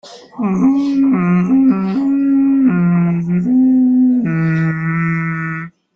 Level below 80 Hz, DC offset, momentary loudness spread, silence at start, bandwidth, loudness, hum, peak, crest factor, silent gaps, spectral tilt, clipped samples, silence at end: -52 dBFS; under 0.1%; 8 LU; 0.05 s; 6.6 kHz; -14 LUFS; none; -4 dBFS; 10 dB; none; -9.5 dB/octave; under 0.1%; 0.25 s